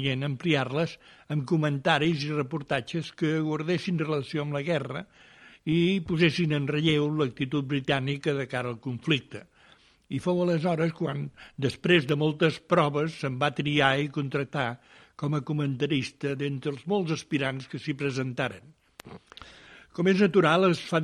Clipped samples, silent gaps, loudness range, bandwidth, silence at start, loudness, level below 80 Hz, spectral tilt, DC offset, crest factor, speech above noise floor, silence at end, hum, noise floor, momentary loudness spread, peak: under 0.1%; none; 4 LU; 11 kHz; 0 s; -27 LUFS; -62 dBFS; -6.5 dB/octave; under 0.1%; 22 dB; 32 dB; 0 s; none; -59 dBFS; 12 LU; -6 dBFS